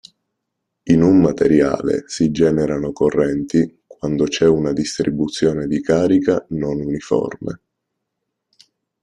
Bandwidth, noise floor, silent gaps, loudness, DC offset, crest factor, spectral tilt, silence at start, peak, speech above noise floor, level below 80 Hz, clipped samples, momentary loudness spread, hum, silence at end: 10.5 kHz; -77 dBFS; none; -18 LUFS; under 0.1%; 16 dB; -6.5 dB/octave; 0.85 s; -2 dBFS; 61 dB; -46 dBFS; under 0.1%; 9 LU; none; 1.45 s